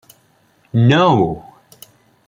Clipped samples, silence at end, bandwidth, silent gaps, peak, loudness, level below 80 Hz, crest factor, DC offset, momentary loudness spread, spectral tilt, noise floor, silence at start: under 0.1%; 0.9 s; 16.5 kHz; none; -2 dBFS; -14 LUFS; -50 dBFS; 16 dB; under 0.1%; 11 LU; -7.5 dB/octave; -56 dBFS; 0.75 s